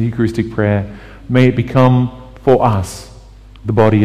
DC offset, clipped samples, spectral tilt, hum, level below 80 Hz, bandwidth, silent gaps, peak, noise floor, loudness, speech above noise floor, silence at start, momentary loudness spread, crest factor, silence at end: under 0.1%; under 0.1%; -8 dB/octave; none; -38 dBFS; 12.5 kHz; none; 0 dBFS; -37 dBFS; -14 LUFS; 25 dB; 0 s; 15 LU; 14 dB; 0 s